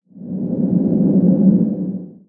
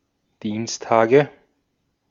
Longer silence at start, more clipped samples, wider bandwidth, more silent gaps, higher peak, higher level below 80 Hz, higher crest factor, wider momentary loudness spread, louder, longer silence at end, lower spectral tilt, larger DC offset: second, 0.15 s vs 0.45 s; neither; second, 1.5 kHz vs 7.6 kHz; neither; about the same, -2 dBFS vs -2 dBFS; first, -52 dBFS vs -66 dBFS; second, 14 dB vs 20 dB; about the same, 13 LU vs 13 LU; first, -16 LUFS vs -20 LUFS; second, 0.15 s vs 0.8 s; first, -15.5 dB/octave vs -5 dB/octave; neither